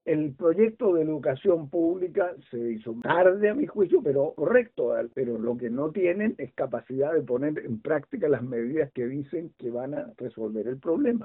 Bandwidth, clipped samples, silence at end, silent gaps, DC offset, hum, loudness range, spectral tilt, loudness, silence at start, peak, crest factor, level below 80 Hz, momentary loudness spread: 4 kHz; under 0.1%; 0 s; none; under 0.1%; none; 5 LU; -11 dB/octave; -27 LUFS; 0.05 s; -6 dBFS; 20 dB; -68 dBFS; 10 LU